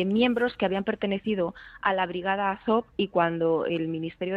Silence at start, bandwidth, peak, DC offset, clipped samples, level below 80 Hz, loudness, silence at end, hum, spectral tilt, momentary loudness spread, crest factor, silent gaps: 0 s; 5.2 kHz; -8 dBFS; under 0.1%; under 0.1%; -60 dBFS; -27 LUFS; 0 s; none; -8 dB/octave; 5 LU; 18 dB; none